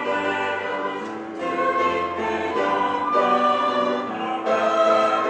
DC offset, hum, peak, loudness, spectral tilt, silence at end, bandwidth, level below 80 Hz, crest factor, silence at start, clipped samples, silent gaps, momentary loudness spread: under 0.1%; none; -8 dBFS; -22 LUFS; -4.5 dB/octave; 0 s; 9.4 kHz; -64 dBFS; 14 dB; 0 s; under 0.1%; none; 9 LU